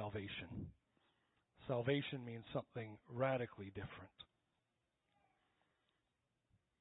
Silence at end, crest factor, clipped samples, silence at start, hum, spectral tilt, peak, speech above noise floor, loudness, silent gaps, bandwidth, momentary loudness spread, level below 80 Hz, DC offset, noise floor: 2.55 s; 22 dB; under 0.1%; 0 s; none; -4.5 dB/octave; -24 dBFS; 43 dB; -45 LUFS; none; 3.9 kHz; 17 LU; -72 dBFS; under 0.1%; -87 dBFS